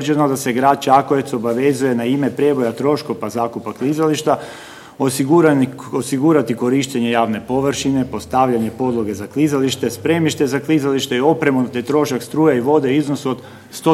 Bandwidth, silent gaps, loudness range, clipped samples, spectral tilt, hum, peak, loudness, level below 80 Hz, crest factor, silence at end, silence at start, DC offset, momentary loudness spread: 15.5 kHz; none; 2 LU; under 0.1%; -5.5 dB/octave; none; 0 dBFS; -17 LUFS; -54 dBFS; 16 dB; 0 s; 0 s; under 0.1%; 8 LU